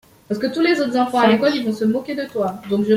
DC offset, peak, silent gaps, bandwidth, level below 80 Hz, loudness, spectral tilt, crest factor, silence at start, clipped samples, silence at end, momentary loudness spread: under 0.1%; -2 dBFS; none; 16 kHz; -60 dBFS; -19 LUFS; -6 dB/octave; 16 dB; 0.3 s; under 0.1%; 0 s; 9 LU